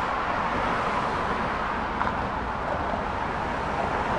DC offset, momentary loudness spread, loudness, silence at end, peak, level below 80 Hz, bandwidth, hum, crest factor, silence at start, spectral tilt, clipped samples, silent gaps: under 0.1%; 3 LU; -27 LUFS; 0 s; -10 dBFS; -40 dBFS; 11.5 kHz; none; 18 dB; 0 s; -6 dB/octave; under 0.1%; none